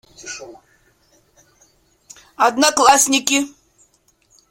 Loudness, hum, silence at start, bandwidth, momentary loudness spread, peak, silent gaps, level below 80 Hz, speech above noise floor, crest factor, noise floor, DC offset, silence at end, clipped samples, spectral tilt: -14 LUFS; none; 0.25 s; 16.5 kHz; 21 LU; 0 dBFS; none; -60 dBFS; 44 dB; 20 dB; -59 dBFS; under 0.1%; 1 s; under 0.1%; 0 dB/octave